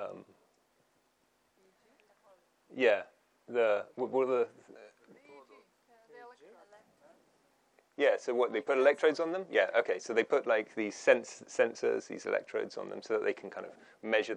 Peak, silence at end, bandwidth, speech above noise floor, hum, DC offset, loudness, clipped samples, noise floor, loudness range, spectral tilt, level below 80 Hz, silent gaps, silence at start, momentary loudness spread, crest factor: -10 dBFS; 0 s; 9.8 kHz; 42 dB; none; under 0.1%; -32 LUFS; under 0.1%; -74 dBFS; 8 LU; -3.5 dB/octave; under -90 dBFS; none; 0 s; 16 LU; 24 dB